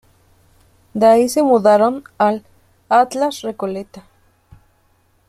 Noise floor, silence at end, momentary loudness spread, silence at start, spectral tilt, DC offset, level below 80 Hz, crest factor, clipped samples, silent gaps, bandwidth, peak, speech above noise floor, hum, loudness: -58 dBFS; 1.3 s; 15 LU; 0.95 s; -5 dB/octave; under 0.1%; -58 dBFS; 16 dB; under 0.1%; none; 15 kHz; -2 dBFS; 43 dB; none; -16 LUFS